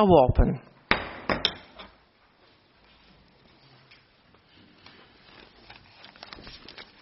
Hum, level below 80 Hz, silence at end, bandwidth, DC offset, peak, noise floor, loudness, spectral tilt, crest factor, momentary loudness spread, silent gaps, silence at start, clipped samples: none; -38 dBFS; 0.2 s; 5.8 kHz; under 0.1%; -2 dBFS; -61 dBFS; -25 LUFS; -4.5 dB/octave; 26 dB; 28 LU; none; 0 s; under 0.1%